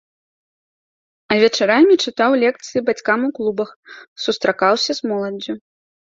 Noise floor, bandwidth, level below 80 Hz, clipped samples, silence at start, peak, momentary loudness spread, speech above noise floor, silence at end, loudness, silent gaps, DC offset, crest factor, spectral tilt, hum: under -90 dBFS; 7.8 kHz; -64 dBFS; under 0.1%; 1.3 s; 0 dBFS; 12 LU; over 73 dB; 0.5 s; -17 LUFS; 3.76-3.83 s, 4.07-4.16 s; under 0.1%; 18 dB; -4 dB/octave; none